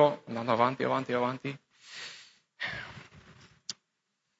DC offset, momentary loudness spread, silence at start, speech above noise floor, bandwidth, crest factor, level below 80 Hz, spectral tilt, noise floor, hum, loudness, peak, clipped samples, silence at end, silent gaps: under 0.1%; 20 LU; 0 s; 51 dB; 8 kHz; 22 dB; -70 dBFS; -5 dB/octave; -81 dBFS; none; -32 LUFS; -10 dBFS; under 0.1%; 0.65 s; none